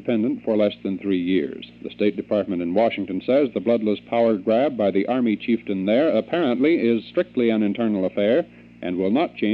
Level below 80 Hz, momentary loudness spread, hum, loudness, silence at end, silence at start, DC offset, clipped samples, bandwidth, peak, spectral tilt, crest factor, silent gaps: -62 dBFS; 5 LU; none; -22 LUFS; 0 s; 0 s; under 0.1%; under 0.1%; 5.4 kHz; -6 dBFS; -9 dB/octave; 16 dB; none